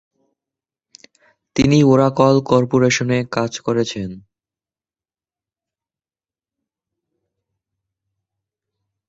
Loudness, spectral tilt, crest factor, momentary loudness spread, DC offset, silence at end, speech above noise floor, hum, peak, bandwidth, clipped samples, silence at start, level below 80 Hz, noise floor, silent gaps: -16 LUFS; -6 dB/octave; 20 dB; 12 LU; under 0.1%; 4.9 s; over 75 dB; none; -2 dBFS; 8 kHz; under 0.1%; 1.55 s; -50 dBFS; under -90 dBFS; none